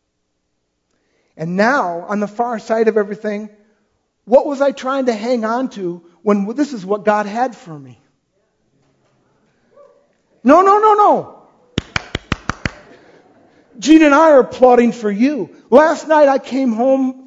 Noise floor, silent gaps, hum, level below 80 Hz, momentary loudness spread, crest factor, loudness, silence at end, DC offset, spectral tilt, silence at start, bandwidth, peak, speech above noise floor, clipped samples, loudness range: -69 dBFS; none; none; -46 dBFS; 16 LU; 16 dB; -15 LUFS; 0.05 s; under 0.1%; -5.5 dB/octave; 1.4 s; 7.8 kHz; 0 dBFS; 56 dB; under 0.1%; 9 LU